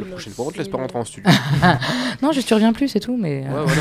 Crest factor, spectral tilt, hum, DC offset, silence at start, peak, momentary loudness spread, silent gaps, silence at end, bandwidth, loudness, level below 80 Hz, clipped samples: 18 dB; -5.5 dB/octave; none; under 0.1%; 0 s; 0 dBFS; 11 LU; none; 0 s; 15 kHz; -19 LUFS; -46 dBFS; under 0.1%